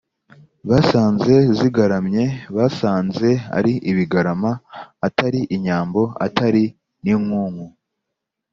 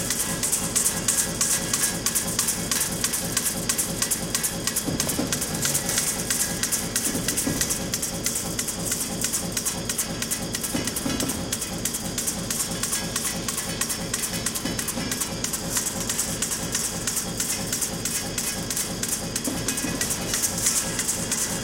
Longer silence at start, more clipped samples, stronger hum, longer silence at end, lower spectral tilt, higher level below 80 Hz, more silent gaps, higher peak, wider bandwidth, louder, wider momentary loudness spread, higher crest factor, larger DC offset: first, 0.65 s vs 0 s; neither; neither; first, 0.85 s vs 0 s; first, -7.5 dB/octave vs -2 dB/octave; second, -52 dBFS vs -44 dBFS; neither; first, 0 dBFS vs -6 dBFS; second, 7.2 kHz vs 17 kHz; first, -18 LUFS vs -24 LUFS; first, 10 LU vs 5 LU; about the same, 18 dB vs 22 dB; neither